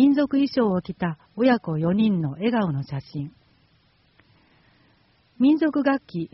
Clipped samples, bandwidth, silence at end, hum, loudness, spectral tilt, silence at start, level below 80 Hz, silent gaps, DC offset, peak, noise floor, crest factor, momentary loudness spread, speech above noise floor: under 0.1%; 6 kHz; 0.05 s; none; -23 LUFS; -6.5 dB/octave; 0 s; -60 dBFS; none; under 0.1%; -8 dBFS; -62 dBFS; 16 dB; 12 LU; 39 dB